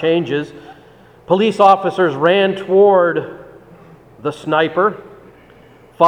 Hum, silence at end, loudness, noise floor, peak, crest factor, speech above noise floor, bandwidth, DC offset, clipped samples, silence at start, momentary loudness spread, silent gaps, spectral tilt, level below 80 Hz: none; 0 s; -15 LUFS; -45 dBFS; 0 dBFS; 16 dB; 30 dB; 9.8 kHz; under 0.1%; under 0.1%; 0 s; 14 LU; none; -6.5 dB/octave; -58 dBFS